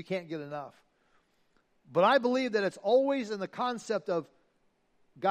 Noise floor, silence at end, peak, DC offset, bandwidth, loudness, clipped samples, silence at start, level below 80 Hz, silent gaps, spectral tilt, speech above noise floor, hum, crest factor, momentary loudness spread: -72 dBFS; 0 s; -12 dBFS; under 0.1%; 10 kHz; -30 LUFS; under 0.1%; 0 s; -82 dBFS; none; -5.5 dB/octave; 42 dB; none; 20 dB; 14 LU